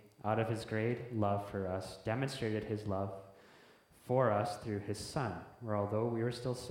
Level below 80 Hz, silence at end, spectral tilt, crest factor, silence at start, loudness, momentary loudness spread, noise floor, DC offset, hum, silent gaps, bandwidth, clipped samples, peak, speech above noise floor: -66 dBFS; 0 s; -6.5 dB/octave; 20 dB; 0.05 s; -37 LUFS; 8 LU; -63 dBFS; under 0.1%; none; none; 16 kHz; under 0.1%; -18 dBFS; 26 dB